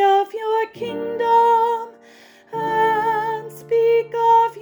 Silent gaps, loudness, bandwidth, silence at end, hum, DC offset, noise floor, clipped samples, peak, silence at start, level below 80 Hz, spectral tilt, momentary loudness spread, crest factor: none; -19 LUFS; over 20 kHz; 0 s; none; under 0.1%; -48 dBFS; under 0.1%; -6 dBFS; 0 s; -68 dBFS; -5 dB/octave; 12 LU; 12 dB